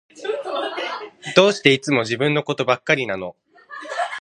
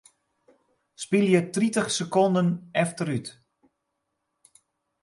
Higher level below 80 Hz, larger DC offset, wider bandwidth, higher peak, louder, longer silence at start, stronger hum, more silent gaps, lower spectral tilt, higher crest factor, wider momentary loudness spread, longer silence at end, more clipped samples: first, -64 dBFS vs -70 dBFS; neither; about the same, 11 kHz vs 11.5 kHz; first, 0 dBFS vs -8 dBFS; first, -20 LUFS vs -24 LUFS; second, 0.15 s vs 1 s; neither; neither; about the same, -4.5 dB/octave vs -5.5 dB/octave; about the same, 22 dB vs 20 dB; first, 15 LU vs 10 LU; second, 0 s vs 1.7 s; neither